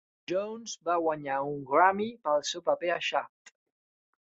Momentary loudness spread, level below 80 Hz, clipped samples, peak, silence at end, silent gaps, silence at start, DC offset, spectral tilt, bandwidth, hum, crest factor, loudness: 10 LU; -76 dBFS; under 0.1%; -10 dBFS; 1.05 s; none; 0.3 s; under 0.1%; -3.5 dB/octave; 8 kHz; none; 22 dB; -29 LUFS